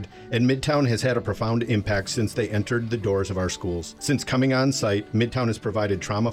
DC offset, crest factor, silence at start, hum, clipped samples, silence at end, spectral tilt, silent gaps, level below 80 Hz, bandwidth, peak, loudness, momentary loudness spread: under 0.1%; 14 dB; 0 s; none; under 0.1%; 0 s; -5.5 dB/octave; none; -46 dBFS; 15.5 kHz; -10 dBFS; -24 LUFS; 5 LU